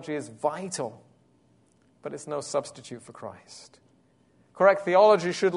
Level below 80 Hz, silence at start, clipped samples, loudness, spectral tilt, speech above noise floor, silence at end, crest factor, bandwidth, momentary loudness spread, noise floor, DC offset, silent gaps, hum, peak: -76 dBFS; 0 s; under 0.1%; -24 LUFS; -4.5 dB/octave; 38 dB; 0 s; 22 dB; 11 kHz; 23 LU; -63 dBFS; under 0.1%; none; none; -6 dBFS